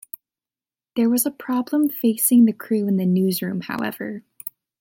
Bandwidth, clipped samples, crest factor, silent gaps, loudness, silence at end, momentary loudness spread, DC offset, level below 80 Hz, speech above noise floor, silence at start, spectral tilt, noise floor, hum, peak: 17 kHz; under 0.1%; 14 dB; none; -20 LUFS; 0.3 s; 19 LU; under 0.1%; -70 dBFS; over 70 dB; 0.95 s; -5.5 dB/octave; under -90 dBFS; none; -6 dBFS